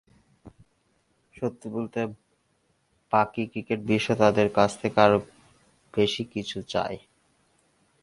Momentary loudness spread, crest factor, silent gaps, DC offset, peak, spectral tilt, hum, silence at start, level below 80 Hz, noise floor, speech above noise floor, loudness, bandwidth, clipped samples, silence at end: 12 LU; 24 dB; none; under 0.1%; -2 dBFS; -5.5 dB/octave; none; 0.45 s; -58 dBFS; -70 dBFS; 45 dB; -26 LUFS; 11.5 kHz; under 0.1%; 1.05 s